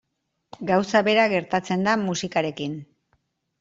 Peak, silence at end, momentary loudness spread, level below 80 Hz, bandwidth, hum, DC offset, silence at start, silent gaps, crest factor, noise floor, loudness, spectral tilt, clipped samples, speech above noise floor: -4 dBFS; 0.75 s; 13 LU; -64 dBFS; 7.8 kHz; none; under 0.1%; 0.6 s; none; 20 dB; -70 dBFS; -22 LUFS; -5 dB/octave; under 0.1%; 48 dB